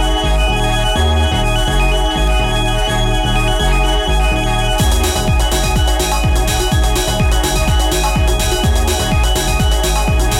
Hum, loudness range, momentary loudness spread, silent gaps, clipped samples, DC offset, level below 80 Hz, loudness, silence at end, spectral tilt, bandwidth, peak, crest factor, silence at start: none; 0 LU; 1 LU; none; under 0.1%; under 0.1%; -16 dBFS; -15 LUFS; 0 s; -4 dB/octave; 16.5 kHz; -6 dBFS; 8 dB; 0 s